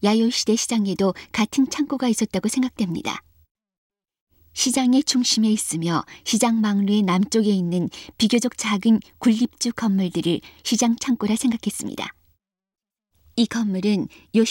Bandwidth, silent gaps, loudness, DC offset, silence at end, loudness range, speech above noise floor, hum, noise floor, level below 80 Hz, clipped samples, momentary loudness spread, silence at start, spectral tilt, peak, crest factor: 16.5 kHz; 3.51-3.55 s, 3.78-3.90 s, 4.21-4.27 s; -21 LUFS; under 0.1%; 0 s; 5 LU; 46 dB; none; -67 dBFS; -58 dBFS; under 0.1%; 7 LU; 0 s; -4.5 dB/octave; -6 dBFS; 16 dB